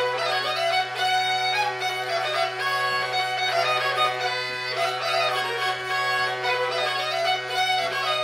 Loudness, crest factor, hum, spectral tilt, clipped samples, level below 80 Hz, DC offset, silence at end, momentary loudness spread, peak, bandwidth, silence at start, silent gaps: -23 LUFS; 14 dB; none; -1.5 dB/octave; under 0.1%; -74 dBFS; under 0.1%; 0 s; 3 LU; -10 dBFS; 16.5 kHz; 0 s; none